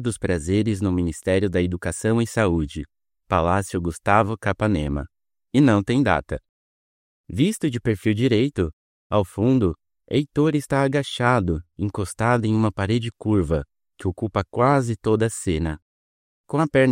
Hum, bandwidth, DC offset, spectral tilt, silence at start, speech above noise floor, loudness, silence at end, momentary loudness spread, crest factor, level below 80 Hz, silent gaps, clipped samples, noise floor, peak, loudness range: none; 16 kHz; under 0.1%; -6.5 dB/octave; 0 s; over 69 dB; -22 LUFS; 0 s; 9 LU; 20 dB; -44 dBFS; 6.49-7.24 s, 8.73-9.10 s, 15.82-16.44 s; under 0.1%; under -90 dBFS; -2 dBFS; 2 LU